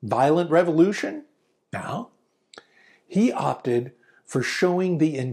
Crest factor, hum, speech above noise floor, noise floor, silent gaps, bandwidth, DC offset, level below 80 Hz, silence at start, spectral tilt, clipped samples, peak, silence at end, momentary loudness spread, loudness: 18 dB; none; 36 dB; -58 dBFS; none; 14 kHz; under 0.1%; -70 dBFS; 0 s; -6.5 dB/octave; under 0.1%; -6 dBFS; 0 s; 15 LU; -23 LUFS